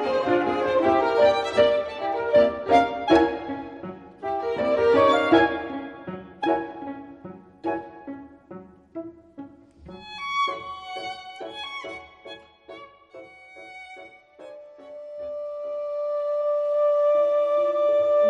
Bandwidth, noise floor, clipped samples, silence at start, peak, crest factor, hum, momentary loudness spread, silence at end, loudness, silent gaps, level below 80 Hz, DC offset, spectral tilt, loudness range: 9 kHz; -46 dBFS; under 0.1%; 0 s; -4 dBFS; 20 dB; none; 24 LU; 0 s; -23 LUFS; none; -58 dBFS; under 0.1%; -5.5 dB/octave; 17 LU